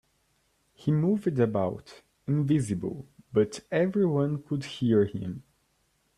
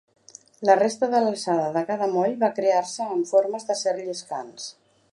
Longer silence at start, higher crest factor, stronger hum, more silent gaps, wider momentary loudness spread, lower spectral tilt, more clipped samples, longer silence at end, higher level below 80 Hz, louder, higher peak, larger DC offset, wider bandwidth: first, 0.8 s vs 0.6 s; about the same, 18 dB vs 20 dB; neither; neither; about the same, 12 LU vs 13 LU; first, -7.5 dB/octave vs -4 dB/octave; neither; first, 0.75 s vs 0.4 s; first, -62 dBFS vs -78 dBFS; second, -28 LUFS vs -23 LUFS; second, -10 dBFS vs -4 dBFS; neither; about the same, 11.5 kHz vs 11.5 kHz